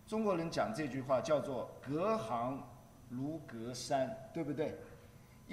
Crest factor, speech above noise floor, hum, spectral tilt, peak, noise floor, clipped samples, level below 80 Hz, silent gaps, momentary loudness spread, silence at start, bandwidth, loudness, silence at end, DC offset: 18 dB; 21 dB; none; -6 dB/octave; -22 dBFS; -58 dBFS; under 0.1%; -68 dBFS; none; 13 LU; 0.05 s; 15 kHz; -38 LUFS; 0 s; under 0.1%